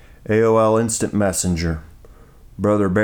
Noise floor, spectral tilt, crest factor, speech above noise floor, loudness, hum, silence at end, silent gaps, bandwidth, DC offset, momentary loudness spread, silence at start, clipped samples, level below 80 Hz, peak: -44 dBFS; -5.5 dB/octave; 14 dB; 27 dB; -18 LUFS; none; 0 s; none; 19 kHz; under 0.1%; 9 LU; 0.3 s; under 0.1%; -40 dBFS; -6 dBFS